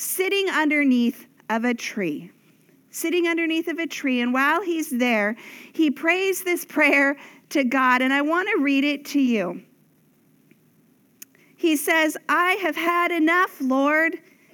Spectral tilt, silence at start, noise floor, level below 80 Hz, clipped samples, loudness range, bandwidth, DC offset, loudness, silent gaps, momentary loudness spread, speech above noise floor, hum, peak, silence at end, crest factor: -3 dB/octave; 0 s; -60 dBFS; -82 dBFS; under 0.1%; 5 LU; 19.5 kHz; under 0.1%; -21 LUFS; none; 9 LU; 38 dB; none; -6 dBFS; 0.35 s; 18 dB